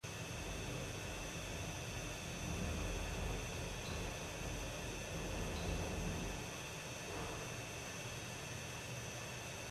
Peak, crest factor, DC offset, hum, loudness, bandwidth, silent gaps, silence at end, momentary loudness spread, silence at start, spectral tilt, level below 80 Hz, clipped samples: -30 dBFS; 14 dB; under 0.1%; none; -44 LUFS; 16 kHz; none; 0 s; 4 LU; 0.05 s; -3.5 dB/octave; -50 dBFS; under 0.1%